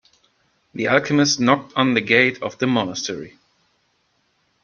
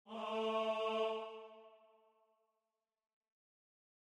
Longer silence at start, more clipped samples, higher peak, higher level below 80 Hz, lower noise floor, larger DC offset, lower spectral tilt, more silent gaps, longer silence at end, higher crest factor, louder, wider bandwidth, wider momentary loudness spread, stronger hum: first, 0.75 s vs 0.05 s; neither; first, -2 dBFS vs -26 dBFS; first, -62 dBFS vs under -90 dBFS; second, -66 dBFS vs under -90 dBFS; neither; about the same, -4 dB/octave vs -4 dB/octave; neither; second, 1.35 s vs 2.3 s; about the same, 20 dB vs 18 dB; first, -19 LUFS vs -39 LUFS; second, 7.2 kHz vs 10.5 kHz; second, 13 LU vs 16 LU; neither